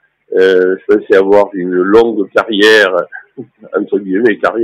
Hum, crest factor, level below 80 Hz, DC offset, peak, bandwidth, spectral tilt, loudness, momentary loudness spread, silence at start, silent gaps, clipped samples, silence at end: none; 10 dB; -52 dBFS; under 0.1%; 0 dBFS; 12.5 kHz; -5 dB/octave; -11 LUFS; 10 LU; 0.3 s; none; 0.4%; 0 s